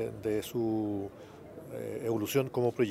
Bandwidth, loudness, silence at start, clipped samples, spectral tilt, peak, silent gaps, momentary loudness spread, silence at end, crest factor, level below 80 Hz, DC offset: 16 kHz; -33 LUFS; 0 s; under 0.1%; -6 dB/octave; -16 dBFS; none; 16 LU; 0 s; 18 dB; -66 dBFS; under 0.1%